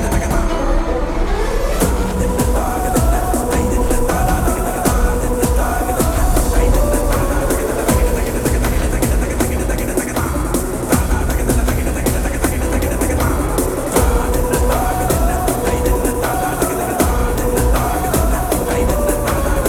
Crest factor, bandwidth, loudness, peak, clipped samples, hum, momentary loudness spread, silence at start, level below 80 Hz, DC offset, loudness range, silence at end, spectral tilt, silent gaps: 16 dB; 18.5 kHz; -17 LUFS; 0 dBFS; under 0.1%; none; 3 LU; 0 s; -18 dBFS; under 0.1%; 1 LU; 0 s; -5.5 dB/octave; none